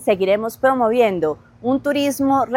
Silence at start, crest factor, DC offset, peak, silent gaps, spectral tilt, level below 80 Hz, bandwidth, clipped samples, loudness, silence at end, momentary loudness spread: 0 s; 14 dB; under 0.1%; -4 dBFS; none; -5 dB/octave; -56 dBFS; 17 kHz; under 0.1%; -19 LUFS; 0 s; 6 LU